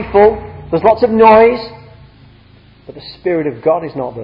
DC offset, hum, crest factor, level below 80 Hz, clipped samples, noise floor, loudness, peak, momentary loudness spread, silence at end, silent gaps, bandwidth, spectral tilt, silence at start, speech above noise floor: under 0.1%; none; 14 dB; -40 dBFS; 0.2%; -44 dBFS; -12 LUFS; 0 dBFS; 20 LU; 0 s; none; 5.4 kHz; -9 dB/octave; 0 s; 32 dB